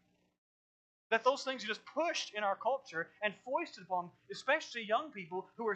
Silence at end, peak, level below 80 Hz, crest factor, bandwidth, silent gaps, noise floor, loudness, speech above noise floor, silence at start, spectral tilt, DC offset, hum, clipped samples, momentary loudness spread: 0 s; -16 dBFS; under -90 dBFS; 22 dB; 8.8 kHz; none; under -90 dBFS; -37 LUFS; over 53 dB; 1.1 s; -3 dB/octave; under 0.1%; none; under 0.1%; 9 LU